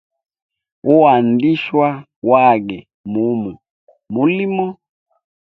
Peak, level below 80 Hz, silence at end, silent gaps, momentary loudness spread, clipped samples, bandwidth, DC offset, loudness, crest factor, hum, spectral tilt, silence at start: 0 dBFS; -60 dBFS; 0.7 s; 2.16-2.22 s, 2.94-3.04 s, 3.70-3.87 s; 14 LU; under 0.1%; 5.2 kHz; under 0.1%; -15 LUFS; 16 dB; none; -9.5 dB/octave; 0.85 s